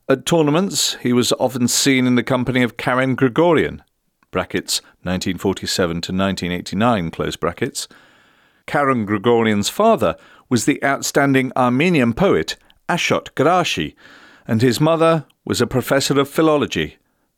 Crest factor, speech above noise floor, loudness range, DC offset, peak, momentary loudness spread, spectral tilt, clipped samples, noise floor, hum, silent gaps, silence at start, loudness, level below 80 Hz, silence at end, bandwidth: 14 dB; 38 dB; 4 LU; under 0.1%; -4 dBFS; 9 LU; -4.5 dB/octave; under 0.1%; -55 dBFS; none; none; 0.1 s; -18 LUFS; -48 dBFS; 0.5 s; 17.5 kHz